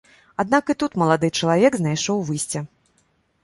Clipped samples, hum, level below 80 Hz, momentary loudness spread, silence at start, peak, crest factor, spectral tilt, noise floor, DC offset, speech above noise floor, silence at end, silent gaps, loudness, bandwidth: under 0.1%; none; -58 dBFS; 11 LU; 0.4 s; -2 dBFS; 20 dB; -5 dB/octave; -64 dBFS; under 0.1%; 44 dB; 0.75 s; none; -21 LUFS; 11.5 kHz